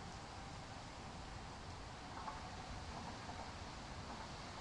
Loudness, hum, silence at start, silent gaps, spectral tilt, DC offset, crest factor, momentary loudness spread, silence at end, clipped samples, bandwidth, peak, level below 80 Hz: -50 LUFS; none; 0 s; none; -4 dB/octave; under 0.1%; 16 dB; 3 LU; 0 s; under 0.1%; 11 kHz; -34 dBFS; -58 dBFS